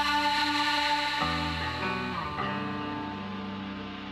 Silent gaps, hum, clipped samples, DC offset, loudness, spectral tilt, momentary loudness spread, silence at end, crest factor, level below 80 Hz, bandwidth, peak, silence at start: none; none; under 0.1%; under 0.1%; -29 LUFS; -4 dB/octave; 11 LU; 0 s; 16 dB; -50 dBFS; 16 kHz; -14 dBFS; 0 s